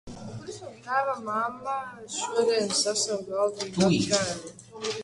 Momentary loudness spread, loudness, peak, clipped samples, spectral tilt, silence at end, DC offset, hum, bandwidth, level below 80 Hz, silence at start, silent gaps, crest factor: 16 LU; -27 LUFS; -8 dBFS; under 0.1%; -3.5 dB/octave; 0 s; under 0.1%; none; 11.5 kHz; -60 dBFS; 0.05 s; none; 20 dB